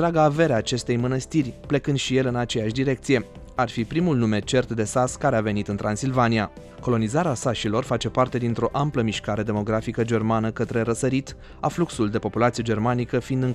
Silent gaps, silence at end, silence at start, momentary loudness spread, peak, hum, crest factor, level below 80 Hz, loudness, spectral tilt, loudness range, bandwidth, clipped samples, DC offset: none; 0 s; 0 s; 4 LU; -6 dBFS; none; 16 dB; -46 dBFS; -24 LUFS; -6 dB/octave; 1 LU; 12.5 kHz; under 0.1%; under 0.1%